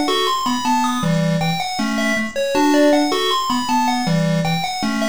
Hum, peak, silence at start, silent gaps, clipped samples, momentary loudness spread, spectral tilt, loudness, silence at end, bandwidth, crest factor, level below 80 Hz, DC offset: none; -4 dBFS; 0 s; none; under 0.1%; 6 LU; -4.5 dB/octave; -18 LUFS; 0 s; over 20 kHz; 14 dB; -50 dBFS; 2%